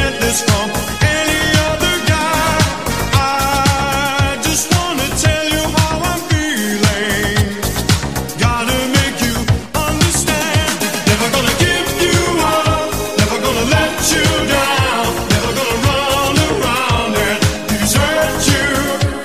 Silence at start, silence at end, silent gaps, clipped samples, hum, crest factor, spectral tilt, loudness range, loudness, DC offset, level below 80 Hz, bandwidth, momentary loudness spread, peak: 0 s; 0 s; none; under 0.1%; none; 14 dB; -3.5 dB/octave; 2 LU; -14 LUFS; 1%; -28 dBFS; 15.5 kHz; 4 LU; 0 dBFS